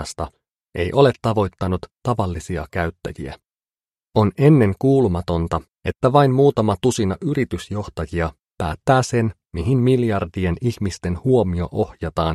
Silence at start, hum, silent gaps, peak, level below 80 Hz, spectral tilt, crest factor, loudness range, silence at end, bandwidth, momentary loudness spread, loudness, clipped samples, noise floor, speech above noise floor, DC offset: 0 s; none; none; 0 dBFS; -40 dBFS; -7 dB/octave; 20 dB; 5 LU; 0 s; 13 kHz; 12 LU; -20 LUFS; under 0.1%; under -90 dBFS; over 71 dB; under 0.1%